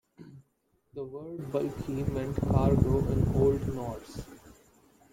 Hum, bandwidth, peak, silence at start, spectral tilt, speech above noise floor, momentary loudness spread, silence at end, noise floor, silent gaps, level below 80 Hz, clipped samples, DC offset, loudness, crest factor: none; 16.5 kHz; -10 dBFS; 0.2 s; -9 dB/octave; 44 dB; 18 LU; 0.65 s; -73 dBFS; none; -42 dBFS; under 0.1%; under 0.1%; -29 LUFS; 20 dB